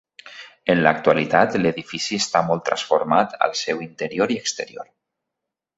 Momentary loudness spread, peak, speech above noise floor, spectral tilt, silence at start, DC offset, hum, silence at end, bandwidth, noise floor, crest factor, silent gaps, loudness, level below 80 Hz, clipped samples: 14 LU; -2 dBFS; 63 dB; -4 dB/octave; 0.25 s; under 0.1%; none; 0.95 s; 8 kHz; -84 dBFS; 20 dB; none; -21 LUFS; -60 dBFS; under 0.1%